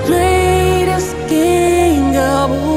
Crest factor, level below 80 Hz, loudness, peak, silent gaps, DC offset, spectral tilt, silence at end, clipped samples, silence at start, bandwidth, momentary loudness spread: 12 dB; -26 dBFS; -13 LUFS; -2 dBFS; none; under 0.1%; -5.5 dB/octave; 0 s; under 0.1%; 0 s; 16 kHz; 4 LU